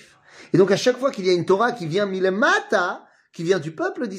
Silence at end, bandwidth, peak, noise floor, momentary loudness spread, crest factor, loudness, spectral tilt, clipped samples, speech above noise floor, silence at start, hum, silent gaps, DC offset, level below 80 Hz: 0 s; 11.5 kHz; -4 dBFS; -48 dBFS; 9 LU; 18 dB; -21 LUFS; -5 dB/octave; under 0.1%; 28 dB; 0.4 s; none; none; under 0.1%; -70 dBFS